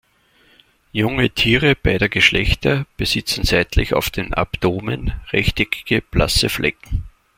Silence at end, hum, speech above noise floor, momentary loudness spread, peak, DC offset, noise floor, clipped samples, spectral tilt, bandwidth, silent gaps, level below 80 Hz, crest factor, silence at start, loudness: 0.3 s; none; 38 dB; 9 LU; 0 dBFS; under 0.1%; -56 dBFS; under 0.1%; -4.5 dB/octave; 16.5 kHz; none; -30 dBFS; 18 dB; 0.95 s; -18 LUFS